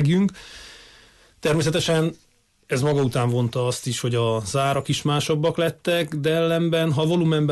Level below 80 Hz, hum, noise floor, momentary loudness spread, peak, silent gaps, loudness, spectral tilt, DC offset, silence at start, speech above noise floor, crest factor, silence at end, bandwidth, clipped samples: -54 dBFS; none; -52 dBFS; 6 LU; -10 dBFS; none; -22 LUFS; -5.5 dB/octave; under 0.1%; 0 s; 31 dB; 12 dB; 0 s; 12.5 kHz; under 0.1%